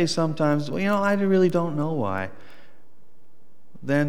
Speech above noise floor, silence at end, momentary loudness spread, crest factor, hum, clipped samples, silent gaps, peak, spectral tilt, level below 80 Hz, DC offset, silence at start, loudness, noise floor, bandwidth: 40 dB; 0 s; 10 LU; 16 dB; none; under 0.1%; none; -10 dBFS; -6.5 dB/octave; -70 dBFS; 2%; 0 s; -23 LUFS; -62 dBFS; 16 kHz